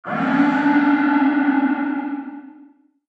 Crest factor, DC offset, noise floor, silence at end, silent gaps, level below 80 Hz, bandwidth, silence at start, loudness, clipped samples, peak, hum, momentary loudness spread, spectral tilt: 14 dB; under 0.1%; -50 dBFS; 0.6 s; none; -66 dBFS; 5 kHz; 0.05 s; -18 LUFS; under 0.1%; -6 dBFS; none; 14 LU; -7.5 dB/octave